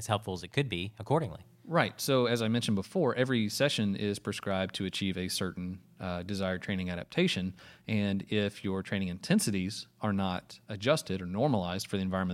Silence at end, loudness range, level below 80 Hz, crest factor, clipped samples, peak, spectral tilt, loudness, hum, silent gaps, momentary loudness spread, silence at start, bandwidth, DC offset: 0 s; 4 LU; -64 dBFS; 24 dB; under 0.1%; -8 dBFS; -5 dB/octave; -32 LUFS; none; none; 8 LU; 0 s; 16 kHz; under 0.1%